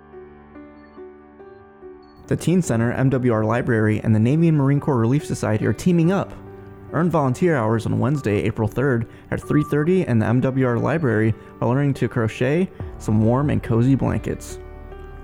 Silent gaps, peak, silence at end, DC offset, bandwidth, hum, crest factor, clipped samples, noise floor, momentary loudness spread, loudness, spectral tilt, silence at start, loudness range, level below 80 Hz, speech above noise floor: none; -6 dBFS; 0 s; under 0.1%; 14.5 kHz; none; 14 dB; under 0.1%; -44 dBFS; 11 LU; -20 LUFS; -8 dB/octave; 0.15 s; 3 LU; -44 dBFS; 25 dB